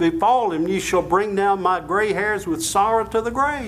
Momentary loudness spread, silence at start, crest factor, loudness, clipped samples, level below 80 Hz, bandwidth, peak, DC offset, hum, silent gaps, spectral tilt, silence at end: 4 LU; 0 s; 12 dB; -20 LUFS; under 0.1%; -46 dBFS; 16 kHz; -8 dBFS; under 0.1%; none; none; -4 dB/octave; 0 s